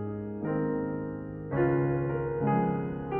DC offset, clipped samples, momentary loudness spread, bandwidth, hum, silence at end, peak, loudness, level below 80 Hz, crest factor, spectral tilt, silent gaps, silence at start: under 0.1%; under 0.1%; 9 LU; 3.2 kHz; none; 0 s; -14 dBFS; -30 LUFS; -52 dBFS; 14 dB; -9.5 dB/octave; none; 0 s